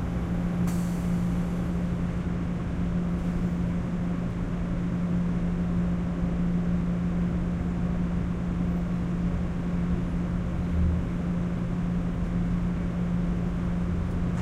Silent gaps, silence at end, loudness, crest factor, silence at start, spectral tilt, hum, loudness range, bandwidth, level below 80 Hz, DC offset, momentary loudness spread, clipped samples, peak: none; 0 s; -29 LUFS; 12 dB; 0 s; -8.5 dB/octave; none; 1 LU; 9 kHz; -34 dBFS; under 0.1%; 2 LU; under 0.1%; -16 dBFS